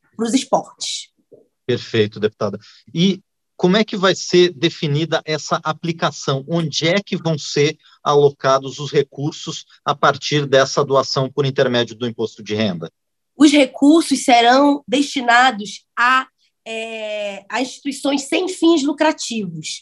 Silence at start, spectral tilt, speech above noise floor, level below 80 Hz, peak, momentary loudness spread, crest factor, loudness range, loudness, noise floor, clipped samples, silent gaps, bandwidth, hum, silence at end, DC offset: 0.2 s; -4.5 dB/octave; 34 dB; -66 dBFS; 0 dBFS; 12 LU; 18 dB; 6 LU; -17 LUFS; -51 dBFS; under 0.1%; none; 12 kHz; none; 0.05 s; under 0.1%